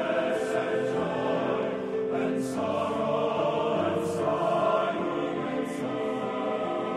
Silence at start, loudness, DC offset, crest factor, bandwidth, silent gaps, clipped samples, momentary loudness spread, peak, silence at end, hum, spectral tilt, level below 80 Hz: 0 s; -28 LUFS; under 0.1%; 14 dB; 13 kHz; none; under 0.1%; 4 LU; -12 dBFS; 0 s; none; -6 dB/octave; -66 dBFS